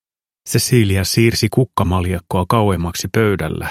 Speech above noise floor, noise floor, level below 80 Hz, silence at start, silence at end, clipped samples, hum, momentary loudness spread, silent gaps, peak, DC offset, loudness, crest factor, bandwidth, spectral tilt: 24 dB; -40 dBFS; -38 dBFS; 0.45 s; 0 s; under 0.1%; none; 6 LU; none; 0 dBFS; under 0.1%; -16 LUFS; 16 dB; 15.5 kHz; -5 dB/octave